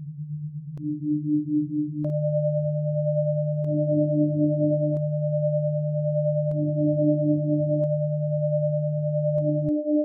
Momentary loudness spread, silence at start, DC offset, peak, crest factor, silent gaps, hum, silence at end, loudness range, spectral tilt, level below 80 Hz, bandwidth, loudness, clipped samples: 5 LU; 0 s; under 0.1%; -12 dBFS; 12 dB; none; none; 0 s; 2 LU; -14 dB/octave; -64 dBFS; 0.8 kHz; -25 LUFS; under 0.1%